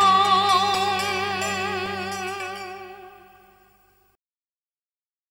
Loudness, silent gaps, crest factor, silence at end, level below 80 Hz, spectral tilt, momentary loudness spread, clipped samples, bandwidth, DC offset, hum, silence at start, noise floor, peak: -22 LUFS; none; 18 dB; 2.15 s; -66 dBFS; -2.5 dB/octave; 19 LU; under 0.1%; 16.5 kHz; under 0.1%; none; 0 s; under -90 dBFS; -6 dBFS